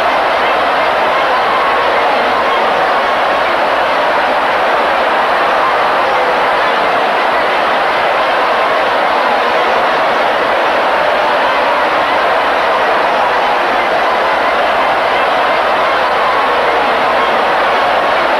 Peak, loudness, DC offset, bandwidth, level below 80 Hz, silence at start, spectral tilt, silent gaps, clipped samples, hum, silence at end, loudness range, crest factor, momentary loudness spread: -2 dBFS; -11 LUFS; under 0.1%; 14 kHz; -46 dBFS; 0 s; -3 dB/octave; none; under 0.1%; none; 0 s; 0 LU; 10 dB; 1 LU